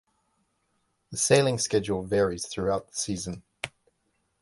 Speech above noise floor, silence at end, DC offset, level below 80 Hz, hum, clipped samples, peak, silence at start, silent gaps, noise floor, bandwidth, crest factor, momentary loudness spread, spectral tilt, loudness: 48 dB; 0.75 s; under 0.1%; -54 dBFS; none; under 0.1%; -8 dBFS; 1.1 s; none; -74 dBFS; 12 kHz; 22 dB; 16 LU; -4 dB/octave; -26 LUFS